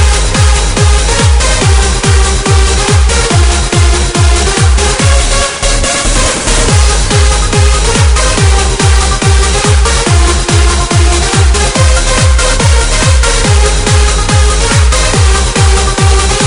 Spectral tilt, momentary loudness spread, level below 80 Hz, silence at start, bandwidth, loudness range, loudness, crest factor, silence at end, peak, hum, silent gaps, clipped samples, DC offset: -3.5 dB/octave; 1 LU; -10 dBFS; 0 s; 11 kHz; 1 LU; -8 LUFS; 8 dB; 0 s; 0 dBFS; none; none; 0.4%; 0.6%